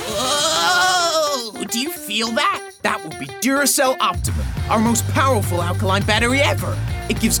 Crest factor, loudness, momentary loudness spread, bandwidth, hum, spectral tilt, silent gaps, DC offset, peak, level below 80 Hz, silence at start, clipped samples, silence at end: 18 dB; -18 LUFS; 8 LU; over 20 kHz; none; -3.5 dB/octave; none; under 0.1%; -2 dBFS; -36 dBFS; 0 s; under 0.1%; 0 s